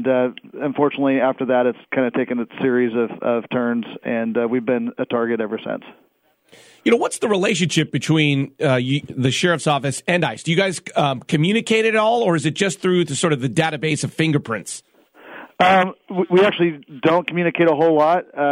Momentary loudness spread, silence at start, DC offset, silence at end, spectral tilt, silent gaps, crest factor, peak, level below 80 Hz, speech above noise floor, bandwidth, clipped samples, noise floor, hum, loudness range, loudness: 8 LU; 0 s; under 0.1%; 0 s; -5 dB/octave; none; 16 dB; -4 dBFS; -64 dBFS; 42 dB; 13.5 kHz; under 0.1%; -61 dBFS; none; 4 LU; -19 LUFS